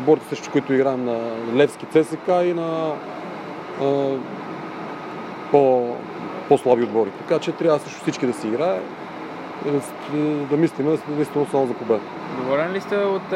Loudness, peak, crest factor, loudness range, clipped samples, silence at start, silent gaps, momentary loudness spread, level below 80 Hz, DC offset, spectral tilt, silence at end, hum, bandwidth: -22 LUFS; -2 dBFS; 20 dB; 3 LU; under 0.1%; 0 s; none; 13 LU; -70 dBFS; under 0.1%; -6.5 dB/octave; 0 s; none; 14.5 kHz